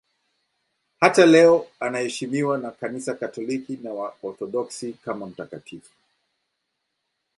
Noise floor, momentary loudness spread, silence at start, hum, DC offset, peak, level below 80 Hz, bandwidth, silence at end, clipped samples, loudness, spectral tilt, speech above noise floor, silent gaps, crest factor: -78 dBFS; 19 LU; 1 s; none; under 0.1%; 0 dBFS; -70 dBFS; 11.5 kHz; 1.6 s; under 0.1%; -22 LUFS; -5 dB/octave; 56 dB; none; 22 dB